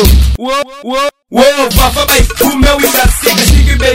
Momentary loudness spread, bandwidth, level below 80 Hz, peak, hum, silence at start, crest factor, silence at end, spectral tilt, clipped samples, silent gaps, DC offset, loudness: 7 LU; 16.5 kHz; -12 dBFS; 0 dBFS; none; 0 s; 8 dB; 0 s; -4 dB/octave; 0.7%; none; under 0.1%; -9 LUFS